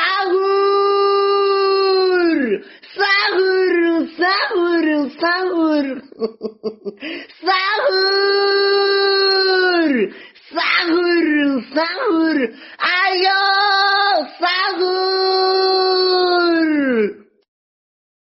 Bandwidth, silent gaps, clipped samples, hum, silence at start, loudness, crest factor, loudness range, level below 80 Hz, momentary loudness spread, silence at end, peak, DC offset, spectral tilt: 5.8 kHz; none; under 0.1%; none; 0 s; -16 LUFS; 14 dB; 3 LU; -66 dBFS; 10 LU; 1.2 s; -2 dBFS; under 0.1%; 0.5 dB/octave